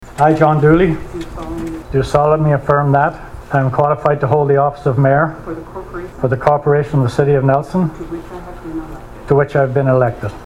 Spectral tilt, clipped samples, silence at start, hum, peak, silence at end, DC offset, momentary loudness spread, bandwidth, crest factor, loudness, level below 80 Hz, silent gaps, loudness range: -8.5 dB/octave; under 0.1%; 0 s; none; 0 dBFS; 0 s; under 0.1%; 16 LU; 11 kHz; 14 dB; -14 LUFS; -36 dBFS; none; 2 LU